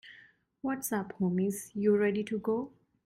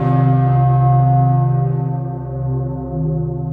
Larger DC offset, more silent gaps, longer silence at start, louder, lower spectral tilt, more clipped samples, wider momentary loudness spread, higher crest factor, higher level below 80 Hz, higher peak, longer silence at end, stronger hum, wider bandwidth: neither; neither; about the same, 0.05 s vs 0 s; second, -32 LUFS vs -16 LUFS; second, -6 dB/octave vs -12.5 dB/octave; neither; about the same, 9 LU vs 10 LU; about the same, 16 dB vs 12 dB; second, -70 dBFS vs -36 dBFS; second, -16 dBFS vs -4 dBFS; first, 0.4 s vs 0 s; neither; first, 16 kHz vs 2.6 kHz